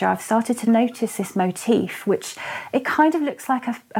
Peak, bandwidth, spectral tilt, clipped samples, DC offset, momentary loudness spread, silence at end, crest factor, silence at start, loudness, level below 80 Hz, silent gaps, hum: -4 dBFS; 17 kHz; -5 dB/octave; under 0.1%; under 0.1%; 7 LU; 0 s; 16 dB; 0 s; -22 LUFS; -68 dBFS; none; none